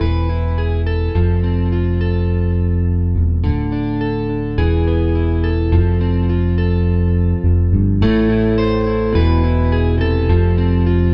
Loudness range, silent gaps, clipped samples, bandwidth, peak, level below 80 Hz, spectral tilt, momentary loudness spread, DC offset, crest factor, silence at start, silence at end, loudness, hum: 2 LU; none; under 0.1%; 5.6 kHz; -2 dBFS; -20 dBFS; -10.5 dB/octave; 4 LU; under 0.1%; 14 dB; 0 s; 0 s; -17 LUFS; none